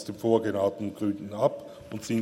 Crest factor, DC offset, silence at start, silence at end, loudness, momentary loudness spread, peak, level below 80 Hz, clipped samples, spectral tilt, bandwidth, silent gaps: 18 dB; under 0.1%; 0 s; 0 s; -28 LUFS; 14 LU; -10 dBFS; -66 dBFS; under 0.1%; -6.5 dB/octave; 16 kHz; none